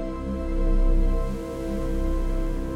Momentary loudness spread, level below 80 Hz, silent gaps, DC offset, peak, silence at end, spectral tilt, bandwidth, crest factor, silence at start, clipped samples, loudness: 6 LU; -24 dBFS; none; under 0.1%; -12 dBFS; 0 s; -8 dB/octave; 7.2 kHz; 12 dB; 0 s; under 0.1%; -28 LUFS